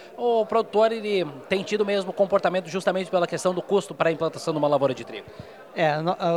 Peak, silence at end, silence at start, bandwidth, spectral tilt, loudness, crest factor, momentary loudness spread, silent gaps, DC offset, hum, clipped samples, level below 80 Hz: -6 dBFS; 0 s; 0 s; 13.5 kHz; -5.5 dB/octave; -24 LUFS; 18 dB; 6 LU; none; under 0.1%; none; under 0.1%; -66 dBFS